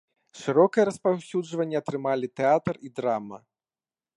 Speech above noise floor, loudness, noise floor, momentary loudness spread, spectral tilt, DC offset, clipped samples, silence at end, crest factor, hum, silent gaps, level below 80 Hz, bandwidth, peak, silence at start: over 65 dB; -26 LUFS; under -90 dBFS; 10 LU; -6.5 dB/octave; under 0.1%; under 0.1%; 0.8 s; 20 dB; none; none; -68 dBFS; 11.5 kHz; -6 dBFS; 0.35 s